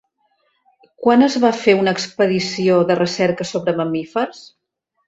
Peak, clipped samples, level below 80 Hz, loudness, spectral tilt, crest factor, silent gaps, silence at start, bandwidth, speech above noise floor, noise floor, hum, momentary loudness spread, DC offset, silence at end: -2 dBFS; under 0.1%; -60 dBFS; -17 LUFS; -5.5 dB/octave; 16 dB; none; 1 s; 8 kHz; 48 dB; -65 dBFS; none; 8 LU; under 0.1%; 0.6 s